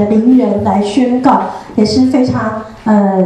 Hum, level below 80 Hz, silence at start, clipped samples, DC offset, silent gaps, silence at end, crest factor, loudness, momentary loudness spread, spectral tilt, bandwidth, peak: none; -44 dBFS; 0 s; under 0.1%; under 0.1%; none; 0 s; 10 dB; -12 LUFS; 8 LU; -7 dB/octave; 9.6 kHz; 0 dBFS